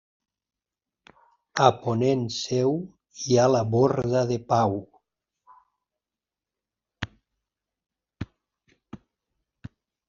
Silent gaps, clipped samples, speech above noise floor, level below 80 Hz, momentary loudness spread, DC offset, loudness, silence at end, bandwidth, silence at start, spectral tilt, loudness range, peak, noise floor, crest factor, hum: none; under 0.1%; 67 dB; -60 dBFS; 19 LU; under 0.1%; -24 LUFS; 0.4 s; 7.4 kHz; 1.55 s; -6 dB/octave; 21 LU; -4 dBFS; -90 dBFS; 22 dB; none